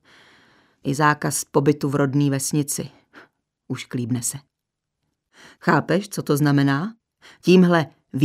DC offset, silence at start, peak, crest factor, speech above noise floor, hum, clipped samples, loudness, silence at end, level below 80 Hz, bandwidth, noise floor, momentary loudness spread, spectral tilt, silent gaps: under 0.1%; 0.85 s; -2 dBFS; 20 dB; 61 dB; none; under 0.1%; -21 LUFS; 0 s; -64 dBFS; 16 kHz; -82 dBFS; 13 LU; -5.5 dB/octave; none